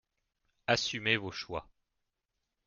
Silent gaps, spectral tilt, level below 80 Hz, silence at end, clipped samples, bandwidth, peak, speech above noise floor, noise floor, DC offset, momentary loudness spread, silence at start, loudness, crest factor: none; -3.5 dB/octave; -64 dBFS; 1.05 s; under 0.1%; 7.4 kHz; -12 dBFS; 52 dB; -85 dBFS; under 0.1%; 12 LU; 0.7 s; -33 LUFS; 26 dB